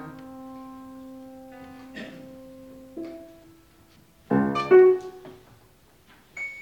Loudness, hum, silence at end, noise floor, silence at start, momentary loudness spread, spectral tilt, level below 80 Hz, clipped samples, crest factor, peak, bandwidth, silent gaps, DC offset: -20 LUFS; none; 0 s; -57 dBFS; 0 s; 28 LU; -7.5 dB/octave; -62 dBFS; under 0.1%; 22 dB; -6 dBFS; 7.4 kHz; none; under 0.1%